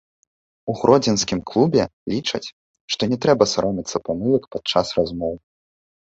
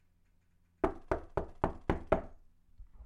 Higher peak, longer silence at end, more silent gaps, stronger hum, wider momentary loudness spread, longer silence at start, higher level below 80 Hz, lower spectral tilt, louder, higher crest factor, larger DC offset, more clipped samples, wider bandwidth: first, -2 dBFS vs -12 dBFS; first, 0.65 s vs 0 s; first, 1.93-2.06 s, 2.53-2.74 s, 2.81-2.88 s vs none; neither; first, 12 LU vs 6 LU; second, 0.65 s vs 0.85 s; about the same, -50 dBFS vs -46 dBFS; second, -5 dB/octave vs -8.5 dB/octave; first, -20 LUFS vs -37 LUFS; second, 20 dB vs 26 dB; neither; neither; second, 8 kHz vs 11 kHz